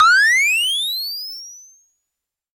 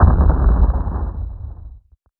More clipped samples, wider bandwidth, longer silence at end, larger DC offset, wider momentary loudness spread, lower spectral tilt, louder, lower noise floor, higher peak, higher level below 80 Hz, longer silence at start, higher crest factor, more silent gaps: neither; first, 17 kHz vs 1.9 kHz; first, 0.95 s vs 0.4 s; neither; about the same, 20 LU vs 19 LU; second, 6 dB/octave vs -12.5 dB/octave; first, -15 LUFS vs -18 LUFS; first, -82 dBFS vs -44 dBFS; second, -4 dBFS vs 0 dBFS; second, -68 dBFS vs -18 dBFS; about the same, 0 s vs 0 s; about the same, 16 dB vs 16 dB; neither